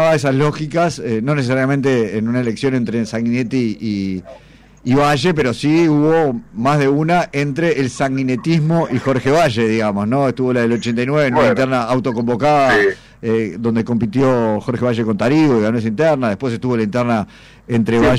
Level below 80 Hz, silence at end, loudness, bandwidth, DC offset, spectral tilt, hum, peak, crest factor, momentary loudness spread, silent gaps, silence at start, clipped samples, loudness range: -44 dBFS; 0 s; -16 LUFS; 12.5 kHz; under 0.1%; -7 dB/octave; none; -6 dBFS; 10 dB; 6 LU; none; 0 s; under 0.1%; 2 LU